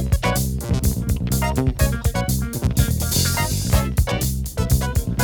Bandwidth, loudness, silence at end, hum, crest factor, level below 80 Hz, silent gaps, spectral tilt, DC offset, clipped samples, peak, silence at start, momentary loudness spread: over 20 kHz; -21 LUFS; 0 s; none; 16 dB; -24 dBFS; none; -5 dB/octave; under 0.1%; under 0.1%; -4 dBFS; 0 s; 4 LU